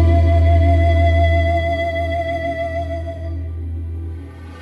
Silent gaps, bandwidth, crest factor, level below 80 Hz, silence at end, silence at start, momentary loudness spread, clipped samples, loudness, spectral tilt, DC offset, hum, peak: none; 5 kHz; 12 dB; -22 dBFS; 0 s; 0 s; 14 LU; under 0.1%; -18 LUFS; -8.5 dB/octave; under 0.1%; none; -4 dBFS